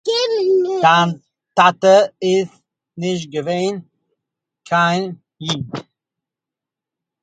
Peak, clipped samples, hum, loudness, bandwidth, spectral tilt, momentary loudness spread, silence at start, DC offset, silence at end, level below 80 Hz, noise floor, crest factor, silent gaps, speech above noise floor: 0 dBFS; under 0.1%; none; -17 LUFS; 9.2 kHz; -5 dB/octave; 16 LU; 0.05 s; under 0.1%; 1.4 s; -62 dBFS; -86 dBFS; 18 dB; none; 70 dB